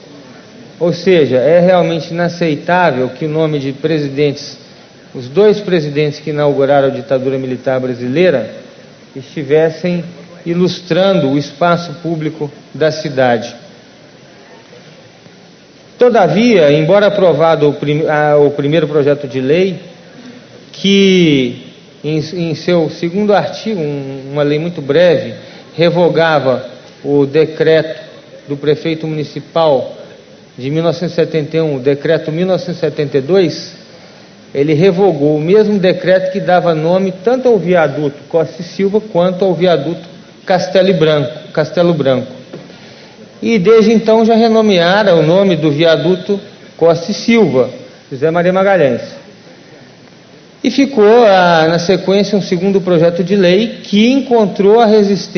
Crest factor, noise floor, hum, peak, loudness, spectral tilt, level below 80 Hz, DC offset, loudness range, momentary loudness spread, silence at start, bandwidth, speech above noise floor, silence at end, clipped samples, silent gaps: 12 dB; -40 dBFS; none; 0 dBFS; -12 LUFS; -6.5 dB/octave; -54 dBFS; under 0.1%; 5 LU; 12 LU; 0.1 s; 6.6 kHz; 29 dB; 0 s; under 0.1%; none